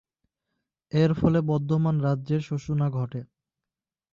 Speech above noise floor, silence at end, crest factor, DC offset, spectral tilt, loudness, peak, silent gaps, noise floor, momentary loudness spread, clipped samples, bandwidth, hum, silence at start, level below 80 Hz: 66 dB; 0.9 s; 18 dB; under 0.1%; -9 dB/octave; -25 LUFS; -10 dBFS; none; -90 dBFS; 8 LU; under 0.1%; 7.2 kHz; none; 0.95 s; -54 dBFS